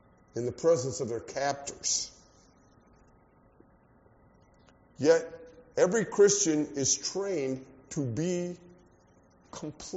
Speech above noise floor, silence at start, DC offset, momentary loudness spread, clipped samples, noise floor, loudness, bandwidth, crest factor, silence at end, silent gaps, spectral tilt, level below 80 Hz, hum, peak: 33 dB; 0.35 s; under 0.1%; 18 LU; under 0.1%; -61 dBFS; -29 LUFS; 8 kHz; 22 dB; 0 s; none; -4.5 dB/octave; -66 dBFS; none; -10 dBFS